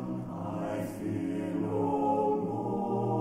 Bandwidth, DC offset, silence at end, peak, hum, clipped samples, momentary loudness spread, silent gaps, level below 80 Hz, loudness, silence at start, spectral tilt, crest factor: 16 kHz; under 0.1%; 0 s; -18 dBFS; none; under 0.1%; 8 LU; none; -60 dBFS; -32 LUFS; 0 s; -8.5 dB/octave; 14 dB